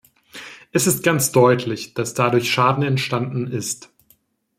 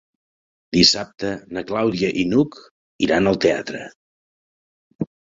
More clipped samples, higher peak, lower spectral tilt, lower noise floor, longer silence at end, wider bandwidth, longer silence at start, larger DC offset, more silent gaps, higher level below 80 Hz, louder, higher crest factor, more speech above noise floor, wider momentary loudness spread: neither; about the same, -2 dBFS vs -2 dBFS; about the same, -4.5 dB/octave vs -4.5 dB/octave; second, -60 dBFS vs under -90 dBFS; first, 0.8 s vs 0.25 s; first, 16.5 kHz vs 7.8 kHz; second, 0.35 s vs 0.7 s; neither; second, none vs 2.71-2.99 s, 3.95-4.99 s; second, -60 dBFS vs -50 dBFS; about the same, -19 LUFS vs -19 LUFS; about the same, 18 dB vs 20 dB; second, 41 dB vs over 70 dB; second, 13 LU vs 16 LU